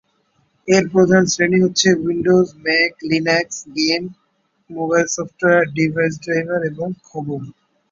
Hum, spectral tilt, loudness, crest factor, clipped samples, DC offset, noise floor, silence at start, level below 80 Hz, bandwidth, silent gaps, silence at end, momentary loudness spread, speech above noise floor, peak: none; -4.5 dB/octave; -17 LUFS; 16 dB; under 0.1%; under 0.1%; -63 dBFS; 0.65 s; -56 dBFS; 7.8 kHz; none; 0.4 s; 13 LU; 46 dB; -2 dBFS